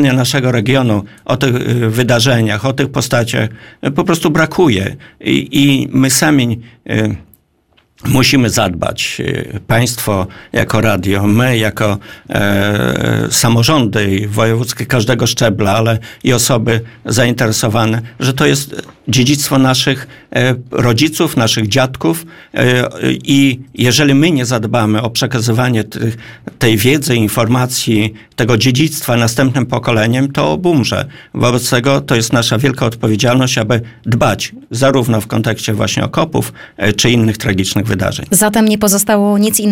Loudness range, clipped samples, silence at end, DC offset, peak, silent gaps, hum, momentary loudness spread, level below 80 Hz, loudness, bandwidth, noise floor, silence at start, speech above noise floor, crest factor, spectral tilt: 2 LU; under 0.1%; 0 s; 0.7%; 0 dBFS; none; none; 7 LU; -40 dBFS; -13 LUFS; 17 kHz; -55 dBFS; 0 s; 42 dB; 12 dB; -4.5 dB/octave